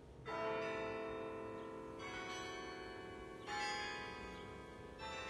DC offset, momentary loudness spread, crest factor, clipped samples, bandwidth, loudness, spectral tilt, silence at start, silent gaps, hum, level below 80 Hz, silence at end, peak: under 0.1%; 10 LU; 16 dB; under 0.1%; 13 kHz; -46 LUFS; -4 dB/octave; 0 s; none; none; -66 dBFS; 0 s; -30 dBFS